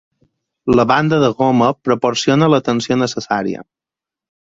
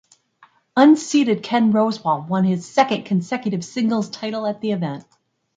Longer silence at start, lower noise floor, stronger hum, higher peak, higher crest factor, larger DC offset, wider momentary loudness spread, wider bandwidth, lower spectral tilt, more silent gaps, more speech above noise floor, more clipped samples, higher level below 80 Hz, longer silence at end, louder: about the same, 0.65 s vs 0.75 s; first, -87 dBFS vs -55 dBFS; neither; about the same, 0 dBFS vs -2 dBFS; about the same, 16 dB vs 18 dB; neither; second, 7 LU vs 11 LU; second, 7.8 kHz vs 9.4 kHz; about the same, -5.5 dB/octave vs -6 dB/octave; neither; first, 73 dB vs 37 dB; neither; first, -48 dBFS vs -68 dBFS; first, 0.85 s vs 0.55 s; first, -15 LUFS vs -19 LUFS